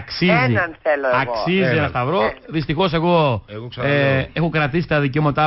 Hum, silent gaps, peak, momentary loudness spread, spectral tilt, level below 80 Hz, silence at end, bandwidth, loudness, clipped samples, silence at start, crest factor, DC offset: none; none; -6 dBFS; 5 LU; -10.5 dB/octave; -42 dBFS; 0 s; 5.8 kHz; -18 LUFS; under 0.1%; 0 s; 12 dB; under 0.1%